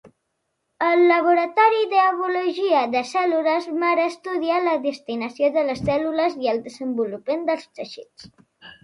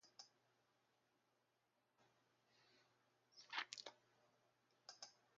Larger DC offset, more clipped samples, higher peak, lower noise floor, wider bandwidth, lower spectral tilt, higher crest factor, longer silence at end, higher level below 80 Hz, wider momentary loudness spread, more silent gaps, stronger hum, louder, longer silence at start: neither; neither; first, -4 dBFS vs -28 dBFS; second, -75 dBFS vs -86 dBFS; first, 11 kHz vs 7.4 kHz; first, -5.5 dB/octave vs 2.5 dB/octave; second, 18 dB vs 34 dB; about the same, 0.15 s vs 0.2 s; first, -58 dBFS vs under -90 dBFS; second, 11 LU vs 17 LU; neither; neither; first, -21 LUFS vs -54 LUFS; about the same, 0.05 s vs 0.05 s